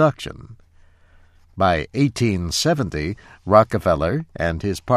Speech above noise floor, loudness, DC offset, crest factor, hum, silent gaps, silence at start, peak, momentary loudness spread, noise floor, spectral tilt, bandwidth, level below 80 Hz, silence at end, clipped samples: 32 dB; -20 LUFS; under 0.1%; 20 dB; none; none; 0 s; 0 dBFS; 15 LU; -52 dBFS; -5.5 dB/octave; 15 kHz; -40 dBFS; 0 s; under 0.1%